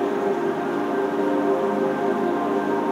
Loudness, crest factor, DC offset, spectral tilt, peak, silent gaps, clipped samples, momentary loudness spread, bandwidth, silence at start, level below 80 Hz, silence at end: -23 LUFS; 12 dB; under 0.1%; -6.5 dB/octave; -10 dBFS; none; under 0.1%; 2 LU; 14.5 kHz; 0 s; -76 dBFS; 0 s